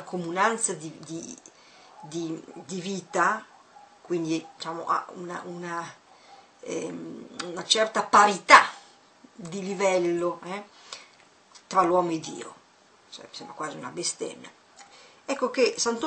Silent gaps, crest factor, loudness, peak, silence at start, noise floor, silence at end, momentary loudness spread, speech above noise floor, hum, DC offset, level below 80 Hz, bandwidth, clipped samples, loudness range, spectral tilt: none; 28 dB; -25 LUFS; 0 dBFS; 0 s; -58 dBFS; 0 s; 22 LU; 32 dB; none; under 0.1%; -76 dBFS; 9 kHz; under 0.1%; 11 LU; -3 dB/octave